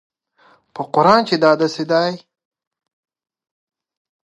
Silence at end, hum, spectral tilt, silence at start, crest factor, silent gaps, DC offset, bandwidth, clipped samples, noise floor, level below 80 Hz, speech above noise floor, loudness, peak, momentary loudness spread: 2.15 s; none; -5.5 dB/octave; 0.75 s; 20 dB; none; under 0.1%; 11.5 kHz; under 0.1%; -55 dBFS; -70 dBFS; 39 dB; -16 LUFS; 0 dBFS; 18 LU